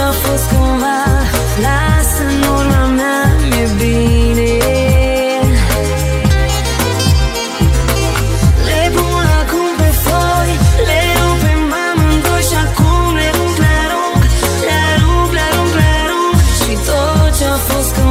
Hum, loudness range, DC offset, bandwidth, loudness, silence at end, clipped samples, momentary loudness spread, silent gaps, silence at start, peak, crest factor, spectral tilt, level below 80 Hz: none; 1 LU; under 0.1%; 16.5 kHz; -12 LUFS; 0 s; under 0.1%; 2 LU; none; 0 s; 0 dBFS; 12 dB; -5 dB/octave; -16 dBFS